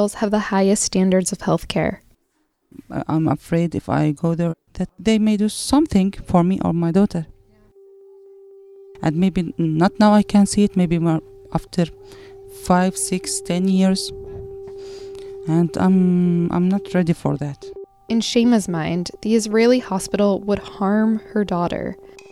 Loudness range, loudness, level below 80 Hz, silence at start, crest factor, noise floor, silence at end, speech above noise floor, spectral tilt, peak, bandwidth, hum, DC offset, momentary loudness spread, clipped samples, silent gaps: 4 LU; -19 LUFS; -44 dBFS; 0 s; 18 dB; -68 dBFS; 0.1 s; 49 dB; -6 dB/octave; -2 dBFS; 13.5 kHz; none; under 0.1%; 15 LU; under 0.1%; none